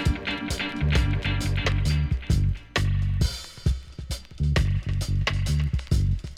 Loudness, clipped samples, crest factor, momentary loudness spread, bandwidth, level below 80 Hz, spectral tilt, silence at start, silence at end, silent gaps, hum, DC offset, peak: -26 LUFS; under 0.1%; 16 dB; 5 LU; 15 kHz; -28 dBFS; -5.5 dB/octave; 0 s; 0.05 s; none; none; under 0.1%; -8 dBFS